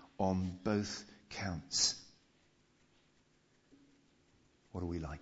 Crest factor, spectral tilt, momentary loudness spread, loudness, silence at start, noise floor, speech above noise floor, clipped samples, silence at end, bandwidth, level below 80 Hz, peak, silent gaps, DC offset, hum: 22 dB; -4 dB/octave; 15 LU; -37 LUFS; 0 s; -72 dBFS; 35 dB; under 0.1%; 0 s; 7.6 kHz; -60 dBFS; -20 dBFS; none; under 0.1%; none